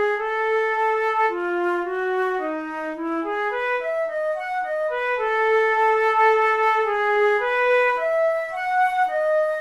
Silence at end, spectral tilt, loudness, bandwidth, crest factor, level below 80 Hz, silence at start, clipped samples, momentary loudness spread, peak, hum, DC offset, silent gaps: 0 s; -3.5 dB/octave; -21 LUFS; 12.5 kHz; 14 dB; -60 dBFS; 0 s; under 0.1%; 7 LU; -6 dBFS; none; under 0.1%; none